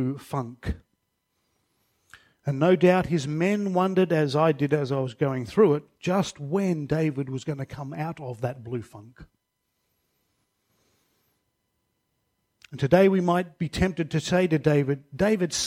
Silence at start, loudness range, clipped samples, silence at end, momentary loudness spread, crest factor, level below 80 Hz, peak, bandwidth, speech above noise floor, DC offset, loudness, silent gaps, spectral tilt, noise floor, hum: 0 s; 14 LU; under 0.1%; 0 s; 14 LU; 20 dB; -50 dBFS; -6 dBFS; 15 kHz; 53 dB; under 0.1%; -25 LUFS; none; -6.5 dB/octave; -77 dBFS; none